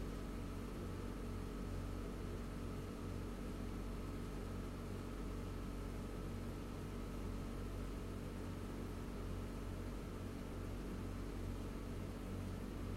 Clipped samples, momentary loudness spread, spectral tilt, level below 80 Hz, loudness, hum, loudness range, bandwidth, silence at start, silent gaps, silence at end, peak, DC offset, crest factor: under 0.1%; 1 LU; -6.5 dB/octave; -50 dBFS; -48 LUFS; none; 0 LU; 16 kHz; 0 s; none; 0 s; -34 dBFS; under 0.1%; 12 dB